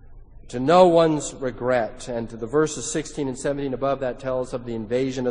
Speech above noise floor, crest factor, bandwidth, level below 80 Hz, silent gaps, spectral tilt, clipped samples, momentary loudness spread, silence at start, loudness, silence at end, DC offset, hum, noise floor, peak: 20 dB; 22 dB; 10 kHz; -44 dBFS; none; -5 dB/octave; under 0.1%; 14 LU; 0.05 s; -23 LUFS; 0 s; under 0.1%; none; -42 dBFS; -2 dBFS